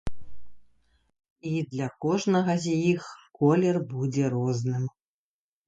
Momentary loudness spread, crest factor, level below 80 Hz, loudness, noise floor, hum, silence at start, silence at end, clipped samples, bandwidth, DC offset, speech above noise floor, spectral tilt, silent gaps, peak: 10 LU; 18 dB; -54 dBFS; -27 LUFS; under -90 dBFS; none; 0.05 s; 0.8 s; under 0.1%; 9.2 kHz; under 0.1%; over 65 dB; -7 dB/octave; 1.30-1.36 s; -10 dBFS